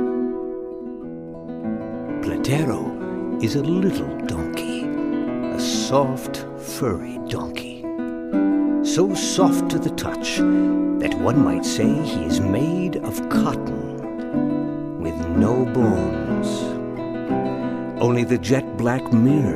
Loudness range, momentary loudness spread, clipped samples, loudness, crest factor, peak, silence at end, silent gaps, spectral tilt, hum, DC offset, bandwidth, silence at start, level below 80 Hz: 4 LU; 10 LU; under 0.1%; -22 LUFS; 18 dB; -4 dBFS; 0 s; none; -6 dB/octave; none; under 0.1%; 15.5 kHz; 0 s; -46 dBFS